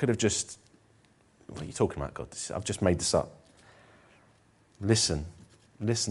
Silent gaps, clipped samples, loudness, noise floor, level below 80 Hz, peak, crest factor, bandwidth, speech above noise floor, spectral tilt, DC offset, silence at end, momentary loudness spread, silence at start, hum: none; under 0.1%; -30 LUFS; -63 dBFS; -52 dBFS; -10 dBFS; 22 dB; 11.5 kHz; 34 dB; -4 dB/octave; under 0.1%; 0 s; 17 LU; 0 s; none